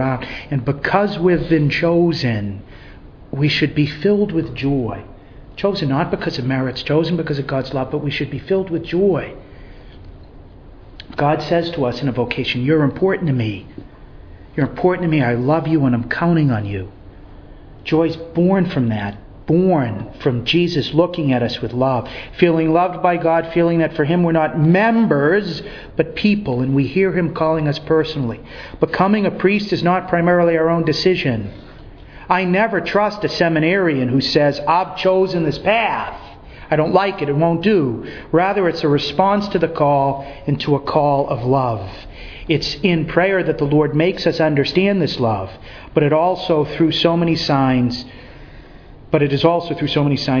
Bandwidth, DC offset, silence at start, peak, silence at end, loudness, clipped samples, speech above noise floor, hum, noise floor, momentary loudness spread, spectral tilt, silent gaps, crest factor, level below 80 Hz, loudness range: 5.4 kHz; under 0.1%; 0 s; 0 dBFS; 0 s; -17 LUFS; under 0.1%; 23 dB; none; -39 dBFS; 9 LU; -7.5 dB/octave; none; 18 dB; -42 dBFS; 4 LU